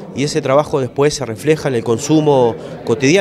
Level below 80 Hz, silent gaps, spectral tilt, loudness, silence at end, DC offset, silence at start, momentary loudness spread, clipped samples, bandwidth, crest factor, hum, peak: -48 dBFS; none; -5.5 dB/octave; -15 LUFS; 0 s; under 0.1%; 0 s; 6 LU; under 0.1%; 13 kHz; 14 dB; none; 0 dBFS